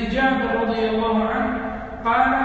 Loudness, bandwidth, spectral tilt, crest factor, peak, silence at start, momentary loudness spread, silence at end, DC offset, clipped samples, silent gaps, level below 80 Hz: -21 LUFS; 7.8 kHz; -7 dB/octave; 16 dB; -6 dBFS; 0 s; 7 LU; 0 s; under 0.1%; under 0.1%; none; -40 dBFS